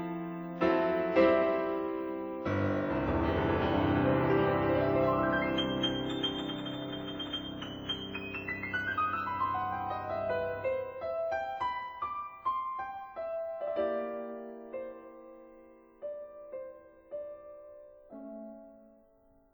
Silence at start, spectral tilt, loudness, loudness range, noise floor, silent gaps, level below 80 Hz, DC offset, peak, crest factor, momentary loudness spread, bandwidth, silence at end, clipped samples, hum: 0 s; -7 dB/octave; -32 LUFS; 17 LU; -64 dBFS; none; -54 dBFS; under 0.1%; -14 dBFS; 20 dB; 18 LU; over 20 kHz; 0.7 s; under 0.1%; none